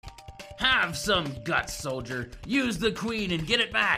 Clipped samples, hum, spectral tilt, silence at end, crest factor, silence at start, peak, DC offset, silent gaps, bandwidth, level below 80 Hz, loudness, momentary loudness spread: under 0.1%; none; -3.5 dB/octave; 0 s; 20 dB; 0.05 s; -8 dBFS; under 0.1%; none; 15.5 kHz; -48 dBFS; -27 LUFS; 12 LU